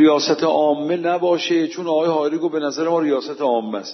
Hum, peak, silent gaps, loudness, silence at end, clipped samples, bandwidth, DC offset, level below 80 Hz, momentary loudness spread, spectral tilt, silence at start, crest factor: none; -4 dBFS; none; -19 LUFS; 0 s; under 0.1%; 6.2 kHz; under 0.1%; -74 dBFS; 4 LU; -5 dB/octave; 0 s; 14 dB